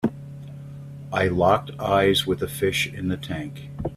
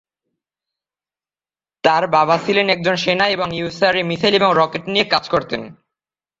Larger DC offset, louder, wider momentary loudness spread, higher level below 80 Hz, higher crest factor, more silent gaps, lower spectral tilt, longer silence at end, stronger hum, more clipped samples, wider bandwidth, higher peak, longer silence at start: neither; second, -23 LUFS vs -16 LUFS; first, 20 LU vs 6 LU; first, -48 dBFS vs -56 dBFS; about the same, 18 dB vs 18 dB; neither; about the same, -5 dB/octave vs -5 dB/octave; second, 0 s vs 0.7 s; neither; neither; first, 16 kHz vs 7.8 kHz; second, -6 dBFS vs 0 dBFS; second, 0 s vs 1.85 s